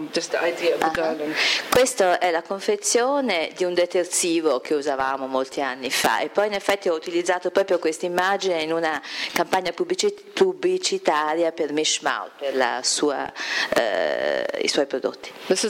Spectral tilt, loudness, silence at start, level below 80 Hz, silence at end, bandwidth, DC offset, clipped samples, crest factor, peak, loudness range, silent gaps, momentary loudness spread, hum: -2 dB/octave; -22 LUFS; 0 s; -62 dBFS; 0 s; 16.5 kHz; under 0.1%; under 0.1%; 18 dB; -6 dBFS; 2 LU; none; 5 LU; none